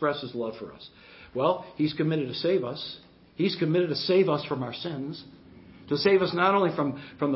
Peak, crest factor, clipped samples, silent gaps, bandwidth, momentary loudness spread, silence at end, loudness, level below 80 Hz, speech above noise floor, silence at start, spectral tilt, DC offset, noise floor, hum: -8 dBFS; 18 dB; under 0.1%; none; 5.8 kHz; 18 LU; 0 s; -27 LUFS; -64 dBFS; 23 dB; 0 s; -10 dB/octave; under 0.1%; -50 dBFS; none